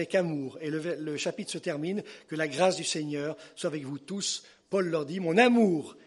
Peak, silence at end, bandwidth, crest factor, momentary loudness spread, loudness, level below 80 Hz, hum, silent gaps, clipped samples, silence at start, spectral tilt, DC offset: -8 dBFS; 0.1 s; 11.5 kHz; 20 dB; 13 LU; -29 LUFS; -78 dBFS; none; none; under 0.1%; 0 s; -4.5 dB/octave; under 0.1%